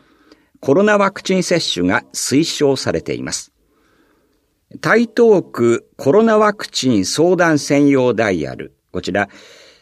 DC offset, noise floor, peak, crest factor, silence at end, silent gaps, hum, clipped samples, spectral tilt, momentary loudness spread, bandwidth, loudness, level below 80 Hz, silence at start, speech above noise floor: under 0.1%; -62 dBFS; 0 dBFS; 16 dB; 0.55 s; none; none; under 0.1%; -4.5 dB/octave; 11 LU; 14.5 kHz; -16 LUFS; -52 dBFS; 0.6 s; 47 dB